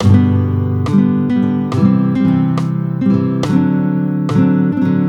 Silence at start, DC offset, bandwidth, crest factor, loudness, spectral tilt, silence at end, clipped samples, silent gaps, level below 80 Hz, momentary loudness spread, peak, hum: 0 s; under 0.1%; 8.4 kHz; 12 dB; -14 LUFS; -9 dB/octave; 0 s; under 0.1%; none; -46 dBFS; 4 LU; 0 dBFS; none